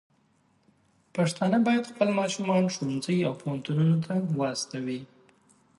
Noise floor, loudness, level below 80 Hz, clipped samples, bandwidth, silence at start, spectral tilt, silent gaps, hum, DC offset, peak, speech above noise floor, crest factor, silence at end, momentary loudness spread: -67 dBFS; -27 LUFS; -70 dBFS; under 0.1%; 11.5 kHz; 1.15 s; -6 dB/octave; none; none; under 0.1%; -10 dBFS; 40 dB; 18 dB; 0.75 s; 9 LU